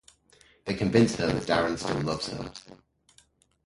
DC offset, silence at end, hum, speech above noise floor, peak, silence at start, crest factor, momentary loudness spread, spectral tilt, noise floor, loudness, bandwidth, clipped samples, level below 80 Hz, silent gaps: under 0.1%; 0.9 s; none; 37 dB; -8 dBFS; 0.65 s; 22 dB; 17 LU; -5.5 dB/octave; -63 dBFS; -27 LUFS; 11.5 kHz; under 0.1%; -52 dBFS; none